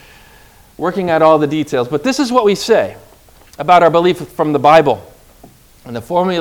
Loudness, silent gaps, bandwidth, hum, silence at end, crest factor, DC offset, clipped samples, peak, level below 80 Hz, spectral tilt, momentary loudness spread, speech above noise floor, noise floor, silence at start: -13 LUFS; none; 19.5 kHz; none; 0 s; 14 dB; under 0.1%; 0.4%; 0 dBFS; -48 dBFS; -5.5 dB/octave; 13 LU; 31 dB; -44 dBFS; 0.8 s